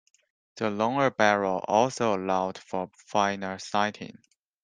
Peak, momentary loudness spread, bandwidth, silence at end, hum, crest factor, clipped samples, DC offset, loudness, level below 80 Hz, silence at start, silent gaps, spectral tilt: -4 dBFS; 11 LU; 9.8 kHz; 0.55 s; none; 22 dB; under 0.1%; under 0.1%; -27 LUFS; -70 dBFS; 0.55 s; none; -4.5 dB/octave